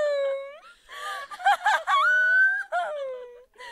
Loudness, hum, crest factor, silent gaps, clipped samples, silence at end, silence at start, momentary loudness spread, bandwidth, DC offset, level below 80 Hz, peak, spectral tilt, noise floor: -23 LUFS; none; 16 dB; none; under 0.1%; 0 s; 0 s; 21 LU; 14 kHz; under 0.1%; -72 dBFS; -10 dBFS; 2 dB/octave; -45 dBFS